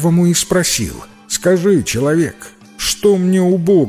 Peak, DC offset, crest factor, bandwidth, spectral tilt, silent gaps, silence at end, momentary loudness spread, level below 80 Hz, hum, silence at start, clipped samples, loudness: -2 dBFS; under 0.1%; 12 dB; 16 kHz; -5 dB/octave; none; 0 s; 9 LU; -40 dBFS; none; 0 s; under 0.1%; -14 LUFS